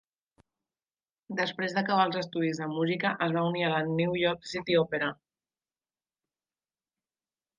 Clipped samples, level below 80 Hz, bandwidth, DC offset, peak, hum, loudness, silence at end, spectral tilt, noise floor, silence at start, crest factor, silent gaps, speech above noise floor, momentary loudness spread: under 0.1%; -70 dBFS; 9.4 kHz; under 0.1%; -12 dBFS; none; -29 LUFS; 2.45 s; -6 dB/octave; under -90 dBFS; 1.3 s; 20 dB; none; over 61 dB; 6 LU